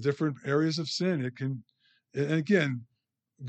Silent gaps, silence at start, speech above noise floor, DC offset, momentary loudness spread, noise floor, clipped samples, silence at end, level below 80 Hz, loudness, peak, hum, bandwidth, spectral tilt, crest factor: none; 0 s; 31 dB; under 0.1%; 12 LU; -60 dBFS; under 0.1%; 0 s; -78 dBFS; -30 LUFS; -12 dBFS; none; 8.8 kHz; -6 dB/octave; 18 dB